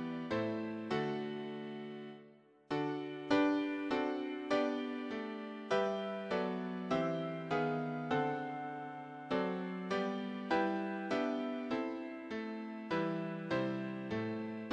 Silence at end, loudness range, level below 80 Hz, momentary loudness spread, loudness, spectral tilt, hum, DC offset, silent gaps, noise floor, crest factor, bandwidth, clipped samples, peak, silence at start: 0 s; 2 LU; -74 dBFS; 9 LU; -38 LUFS; -7 dB/octave; none; under 0.1%; none; -62 dBFS; 20 dB; 9.2 kHz; under 0.1%; -18 dBFS; 0 s